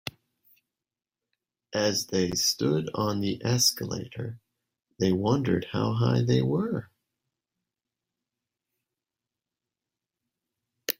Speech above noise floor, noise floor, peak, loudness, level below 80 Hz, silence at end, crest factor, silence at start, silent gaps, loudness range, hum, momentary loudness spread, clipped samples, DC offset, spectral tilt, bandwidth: over 64 dB; under -90 dBFS; -2 dBFS; -26 LUFS; -62 dBFS; 0.05 s; 28 dB; 0.05 s; none; 5 LU; none; 12 LU; under 0.1%; under 0.1%; -4.5 dB/octave; 16 kHz